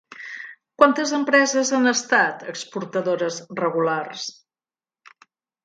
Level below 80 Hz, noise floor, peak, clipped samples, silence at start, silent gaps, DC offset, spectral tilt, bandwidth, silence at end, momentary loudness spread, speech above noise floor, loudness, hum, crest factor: -70 dBFS; under -90 dBFS; 0 dBFS; under 0.1%; 0.1 s; none; under 0.1%; -3 dB/octave; 9.4 kHz; 1.35 s; 17 LU; over 69 dB; -21 LUFS; none; 22 dB